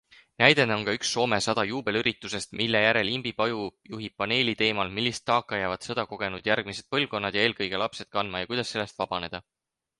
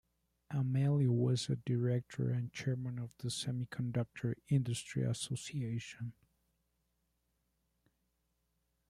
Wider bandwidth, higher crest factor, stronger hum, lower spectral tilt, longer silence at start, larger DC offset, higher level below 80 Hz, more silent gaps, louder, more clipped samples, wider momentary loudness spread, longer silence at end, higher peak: about the same, 11.5 kHz vs 12.5 kHz; first, 26 dB vs 18 dB; neither; second, -3.5 dB/octave vs -6 dB/octave; about the same, 0.4 s vs 0.5 s; neither; first, -60 dBFS vs -70 dBFS; neither; first, -26 LUFS vs -37 LUFS; neither; about the same, 10 LU vs 10 LU; second, 0.6 s vs 2.75 s; first, -2 dBFS vs -20 dBFS